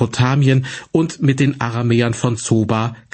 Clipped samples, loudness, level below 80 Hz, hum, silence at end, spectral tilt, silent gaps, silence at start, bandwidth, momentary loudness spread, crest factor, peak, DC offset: under 0.1%; -17 LUFS; -50 dBFS; none; 0.15 s; -6 dB/octave; none; 0 s; 8.8 kHz; 5 LU; 14 dB; -2 dBFS; under 0.1%